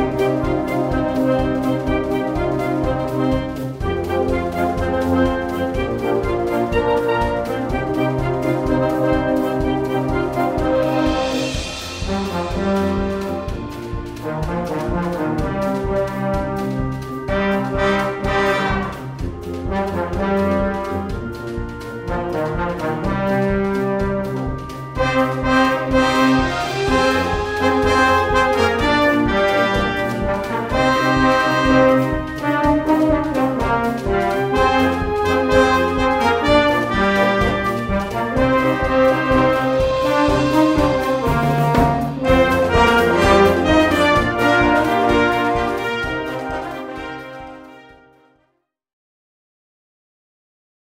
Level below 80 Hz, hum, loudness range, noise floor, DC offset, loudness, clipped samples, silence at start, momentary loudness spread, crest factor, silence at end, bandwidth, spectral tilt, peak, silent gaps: -32 dBFS; none; 7 LU; -68 dBFS; under 0.1%; -18 LUFS; under 0.1%; 0 s; 10 LU; 18 dB; 3.05 s; 16 kHz; -6 dB/octave; 0 dBFS; none